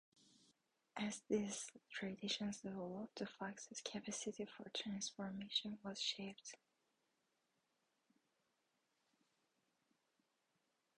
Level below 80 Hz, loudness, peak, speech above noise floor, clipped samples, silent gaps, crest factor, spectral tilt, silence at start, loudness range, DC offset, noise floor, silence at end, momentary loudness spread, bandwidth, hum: -84 dBFS; -46 LUFS; -28 dBFS; 39 dB; under 0.1%; none; 22 dB; -3 dB/octave; 0.95 s; 6 LU; under 0.1%; -86 dBFS; 4.4 s; 8 LU; 10.5 kHz; none